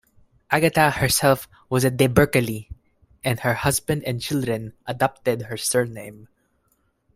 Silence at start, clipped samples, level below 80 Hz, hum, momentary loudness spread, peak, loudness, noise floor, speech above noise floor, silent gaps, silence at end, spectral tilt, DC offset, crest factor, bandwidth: 0.5 s; under 0.1%; -48 dBFS; none; 11 LU; 0 dBFS; -22 LUFS; -67 dBFS; 46 dB; none; 0.9 s; -4.5 dB/octave; under 0.1%; 22 dB; 16 kHz